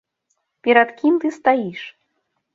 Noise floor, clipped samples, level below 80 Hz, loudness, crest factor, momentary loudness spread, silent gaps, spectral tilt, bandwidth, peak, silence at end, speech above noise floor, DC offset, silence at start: -72 dBFS; under 0.1%; -70 dBFS; -18 LUFS; 18 dB; 17 LU; none; -6 dB/octave; 7.6 kHz; -2 dBFS; 0.65 s; 55 dB; under 0.1%; 0.65 s